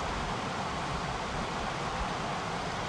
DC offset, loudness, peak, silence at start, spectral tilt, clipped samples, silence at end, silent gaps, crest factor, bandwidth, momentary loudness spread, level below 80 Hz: under 0.1%; -34 LUFS; -22 dBFS; 0 s; -4.5 dB/octave; under 0.1%; 0 s; none; 12 dB; 12.5 kHz; 1 LU; -46 dBFS